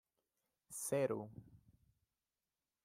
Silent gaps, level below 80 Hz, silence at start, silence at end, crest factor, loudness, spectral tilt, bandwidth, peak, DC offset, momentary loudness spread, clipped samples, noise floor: none; -80 dBFS; 0.7 s; 1.3 s; 20 dB; -41 LUFS; -5 dB/octave; 16 kHz; -26 dBFS; under 0.1%; 17 LU; under 0.1%; under -90 dBFS